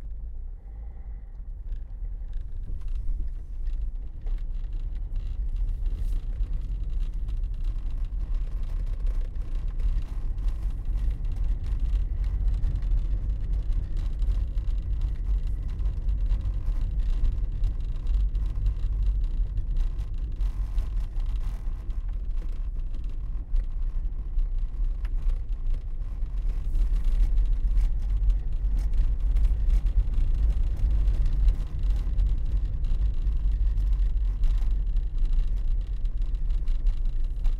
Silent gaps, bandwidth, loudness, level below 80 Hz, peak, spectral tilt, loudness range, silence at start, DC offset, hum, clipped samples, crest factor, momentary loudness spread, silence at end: none; 4.2 kHz; -32 LUFS; -26 dBFS; -10 dBFS; -8 dB/octave; 7 LU; 0 s; under 0.1%; none; under 0.1%; 14 dB; 9 LU; 0 s